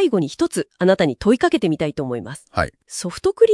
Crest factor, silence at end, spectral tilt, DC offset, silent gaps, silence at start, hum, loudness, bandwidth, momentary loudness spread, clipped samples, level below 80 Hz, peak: 16 dB; 0 s; -5.5 dB/octave; under 0.1%; none; 0 s; none; -20 LUFS; 12 kHz; 10 LU; under 0.1%; -48 dBFS; -2 dBFS